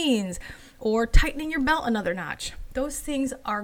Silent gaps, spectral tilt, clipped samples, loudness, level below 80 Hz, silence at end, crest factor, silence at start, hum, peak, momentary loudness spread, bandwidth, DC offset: none; -4.5 dB/octave; under 0.1%; -27 LUFS; -30 dBFS; 0 s; 20 dB; 0 s; none; -4 dBFS; 10 LU; 16.5 kHz; under 0.1%